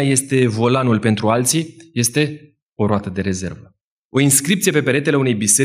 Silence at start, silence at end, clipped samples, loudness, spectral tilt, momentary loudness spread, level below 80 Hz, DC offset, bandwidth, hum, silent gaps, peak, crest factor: 0 s; 0 s; under 0.1%; -17 LUFS; -4 dB/octave; 9 LU; -56 dBFS; under 0.1%; 16 kHz; none; 2.62-2.76 s, 3.81-4.10 s; -2 dBFS; 16 dB